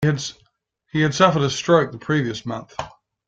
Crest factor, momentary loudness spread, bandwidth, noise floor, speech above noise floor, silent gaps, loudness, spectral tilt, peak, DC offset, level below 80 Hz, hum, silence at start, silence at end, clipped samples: 20 dB; 16 LU; 7.8 kHz; -65 dBFS; 45 dB; none; -20 LUFS; -5.5 dB/octave; -2 dBFS; under 0.1%; -54 dBFS; none; 0 s; 0.4 s; under 0.1%